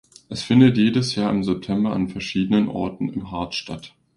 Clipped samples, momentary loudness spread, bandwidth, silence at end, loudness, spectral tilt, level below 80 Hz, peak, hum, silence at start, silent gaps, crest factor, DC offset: under 0.1%; 14 LU; 11 kHz; 0.3 s; -21 LUFS; -6.5 dB/octave; -50 dBFS; -2 dBFS; none; 0.3 s; none; 18 dB; under 0.1%